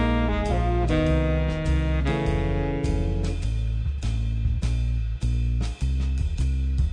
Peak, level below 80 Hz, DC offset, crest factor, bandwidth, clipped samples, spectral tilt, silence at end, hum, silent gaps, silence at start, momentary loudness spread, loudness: -12 dBFS; -26 dBFS; under 0.1%; 12 dB; 9.8 kHz; under 0.1%; -7.5 dB/octave; 0 s; none; none; 0 s; 5 LU; -26 LUFS